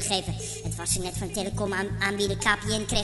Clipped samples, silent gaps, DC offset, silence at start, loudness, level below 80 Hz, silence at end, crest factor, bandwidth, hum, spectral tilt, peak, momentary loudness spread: under 0.1%; none; under 0.1%; 0 s; -27 LUFS; -42 dBFS; 0 s; 20 dB; 12 kHz; none; -3 dB/octave; -8 dBFS; 7 LU